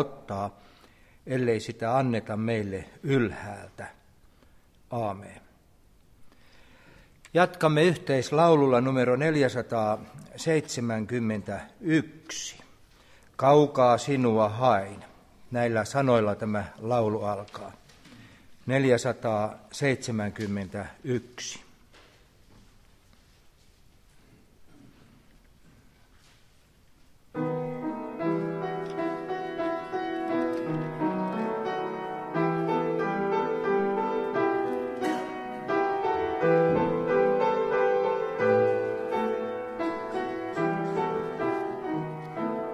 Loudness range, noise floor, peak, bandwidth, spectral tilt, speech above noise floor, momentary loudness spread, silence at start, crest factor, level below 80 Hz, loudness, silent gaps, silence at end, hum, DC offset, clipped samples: 11 LU; -59 dBFS; -8 dBFS; 14 kHz; -6 dB/octave; 33 dB; 12 LU; 0 s; 22 dB; -60 dBFS; -27 LUFS; none; 0 s; none; under 0.1%; under 0.1%